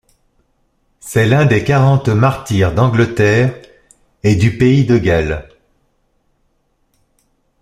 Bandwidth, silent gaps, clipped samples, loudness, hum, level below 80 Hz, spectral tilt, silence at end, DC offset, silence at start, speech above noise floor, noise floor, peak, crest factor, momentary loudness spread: 14.5 kHz; none; under 0.1%; -13 LUFS; none; -38 dBFS; -7 dB/octave; 2.2 s; under 0.1%; 1.05 s; 50 dB; -62 dBFS; 0 dBFS; 14 dB; 8 LU